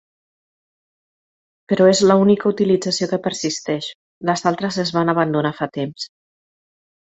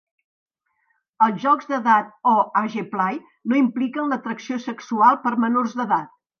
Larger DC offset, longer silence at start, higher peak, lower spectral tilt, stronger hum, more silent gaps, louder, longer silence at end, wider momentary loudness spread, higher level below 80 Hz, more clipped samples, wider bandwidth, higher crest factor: neither; first, 1.7 s vs 1.2 s; about the same, -2 dBFS vs -2 dBFS; about the same, -5 dB/octave vs -6 dB/octave; neither; first, 3.95-4.21 s vs none; first, -18 LUFS vs -21 LUFS; first, 0.95 s vs 0.35 s; first, 13 LU vs 10 LU; first, -60 dBFS vs -78 dBFS; neither; first, 8.2 kHz vs 6.8 kHz; about the same, 18 dB vs 20 dB